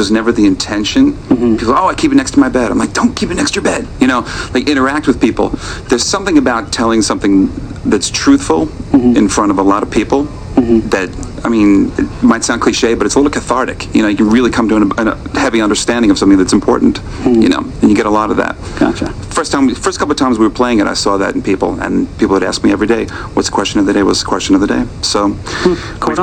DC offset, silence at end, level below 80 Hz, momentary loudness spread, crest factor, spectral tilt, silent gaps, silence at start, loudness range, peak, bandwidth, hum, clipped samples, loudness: under 0.1%; 0 s; -30 dBFS; 6 LU; 12 dB; -4.5 dB/octave; none; 0 s; 2 LU; 0 dBFS; 9.8 kHz; none; 0.2%; -12 LUFS